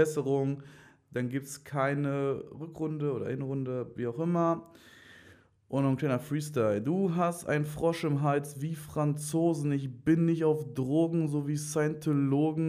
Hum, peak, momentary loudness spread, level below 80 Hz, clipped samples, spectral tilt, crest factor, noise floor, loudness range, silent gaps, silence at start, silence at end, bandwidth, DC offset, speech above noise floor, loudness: none; -12 dBFS; 8 LU; -66 dBFS; under 0.1%; -7 dB/octave; 18 dB; -58 dBFS; 4 LU; none; 0 s; 0 s; 15.5 kHz; under 0.1%; 29 dB; -31 LUFS